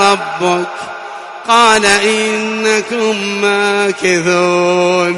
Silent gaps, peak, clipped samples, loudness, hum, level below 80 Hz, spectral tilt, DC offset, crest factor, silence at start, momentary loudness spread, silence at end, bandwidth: none; 0 dBFS; under 0.1%; -12 LUFS; none; -52 dBFS; -3 dB/octave; under 0.1%; 12 dB; 0 s; 14 LU; 0 s; 12 kHz